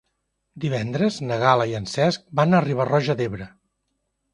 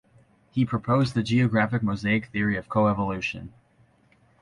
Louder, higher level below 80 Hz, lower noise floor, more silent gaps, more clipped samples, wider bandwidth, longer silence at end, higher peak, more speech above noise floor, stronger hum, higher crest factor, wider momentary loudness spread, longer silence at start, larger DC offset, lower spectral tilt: first, -22 LUFS vs -25 LUFS; about the same, -56 dBFS vs -52 dBFS; first, -75 dBFS vs -61 dBFS; neither; neither; about the same, 11 kHz vs 11 kHz; about the same, 0.85 s vs 0.95 s; first, -2 dBFS vs -10 dBFS; first, 54 dB vs 37 dB; neither; first, 22 dB vs 16 dB; about the same, 10 LU vs 8 LU; about the same, 0.55 s vs 0.55 s; neither; about the same, -6.5 dB/octave vs -7.5 dB/octave